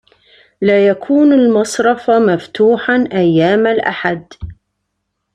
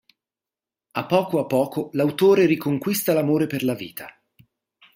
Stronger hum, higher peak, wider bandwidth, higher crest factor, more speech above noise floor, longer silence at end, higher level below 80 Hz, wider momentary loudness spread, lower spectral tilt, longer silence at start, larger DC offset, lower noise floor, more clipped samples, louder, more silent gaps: neither; first, 0 dBFS vs -4 dBFS; second, 13 kHz vs 16 kHz; second, 12 dB vs 18 dB; second, 60 dB vs over 69 dB; about the same, 0.8 s vs 0.85 s; first, -46 dBFS vs -66 dBFS; second, 9 LU vs 14 LU; about the same, -6 dB/octave vs -6 dB/octave; second, 0.6 s vs 0.95 s; neither; second, -71 dBFS vs under -90 dBFS; neither; first, -12 LUFS vs -21 LUFS; neither